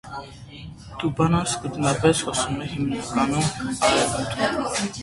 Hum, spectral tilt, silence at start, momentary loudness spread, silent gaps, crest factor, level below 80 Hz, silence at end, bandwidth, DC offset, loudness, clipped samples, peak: none; -4.5 dB/octave; 0.05 s; 18 LU; none; 20 dB; -46 dBFS; 0 s; 11.5 kHz; under 0.1%; -23 LUFS; under 0.1%; -4 dBFS